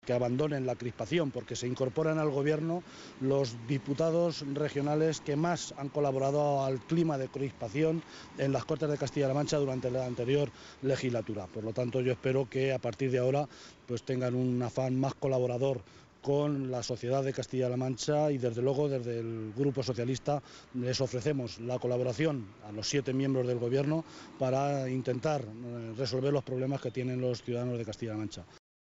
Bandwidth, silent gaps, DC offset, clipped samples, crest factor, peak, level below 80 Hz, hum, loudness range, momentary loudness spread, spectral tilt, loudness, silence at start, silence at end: 8 kHz; none; under 0.1%; under 0.1%; 16 dB; -16 dBFS; -64 dBFS; none; 2 LU; 7 LU; -6.5 dB/octave; -32 LUFS; 0.05 s; 0.35 s